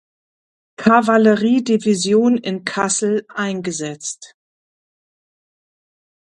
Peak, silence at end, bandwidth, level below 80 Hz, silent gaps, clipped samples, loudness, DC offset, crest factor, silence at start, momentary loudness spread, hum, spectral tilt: 0 dBFS; 1.95 s; 11 kHz; -64 dBFS; none; under 0.1%; -17 LUFS; under 0.1%; 18 dB; 0.8 s; 12 LU; none; -4.5 dB/octave